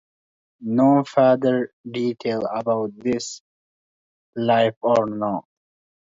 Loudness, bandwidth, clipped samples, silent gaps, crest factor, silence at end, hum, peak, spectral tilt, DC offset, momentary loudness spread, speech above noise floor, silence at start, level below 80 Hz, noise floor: -21 LUFS; 7.8 kHz; under 0.1%; 1.73-1.84 s, 3.40-4.33 s, 4.77-4.81 s; 18 dB; 0.65 s; none; -4 dBFS; -6 dB/octave; under 0.1%; 13 LU; over 70 dB; 0.6 s; -66 dBFS; under -90 dBFS